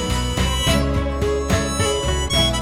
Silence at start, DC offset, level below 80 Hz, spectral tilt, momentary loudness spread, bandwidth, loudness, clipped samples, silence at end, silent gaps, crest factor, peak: 0 s; under 0.1%; -24 dBFS; -4 dB/octave; 4 LU; 16.5 kHz; -20 LUFS; under 0.1%; 0 s; none; 14 dB; -6 dBFS